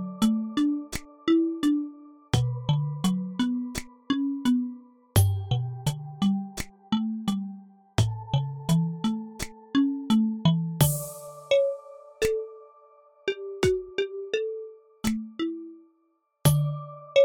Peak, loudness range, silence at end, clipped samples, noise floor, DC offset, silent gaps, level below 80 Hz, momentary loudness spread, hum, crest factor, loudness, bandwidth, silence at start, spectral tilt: -8 dBFS; 5 LU; 0 s; under 0.1%; -70 dBFS; under 0.1%; none; -50 dBFS; 13 LU; none; 20 dB; -27 LUFS; 19 kHz; 0 s; -6 dB/octave